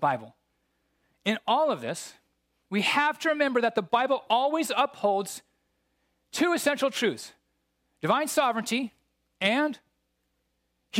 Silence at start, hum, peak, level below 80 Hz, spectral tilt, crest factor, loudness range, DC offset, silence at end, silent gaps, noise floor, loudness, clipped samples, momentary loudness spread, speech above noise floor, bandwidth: 0 s; 60 Hz at -70 dBFS; -10 dBFS; -78 dBFS; -3.5 dB/octave; 20 dB; 3 LU; under 0.1%; 0 s; none; -76 dBFS; -27 LUFS; under 0.1%; 13 LU; 50 dB; 16.5 kHz